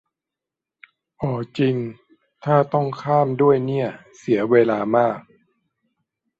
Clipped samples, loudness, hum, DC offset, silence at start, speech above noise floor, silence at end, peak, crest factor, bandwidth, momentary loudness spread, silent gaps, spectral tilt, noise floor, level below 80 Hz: under 0.1%; -20 LUFS; none; under 0.1%; 1.2 s; 67 dB; 1.2 s; -2 dBFS; 20 dB; 7.8 kHz; 12 LU; none; -8.5 dB/octave; -87 dBFS; -62 dBFS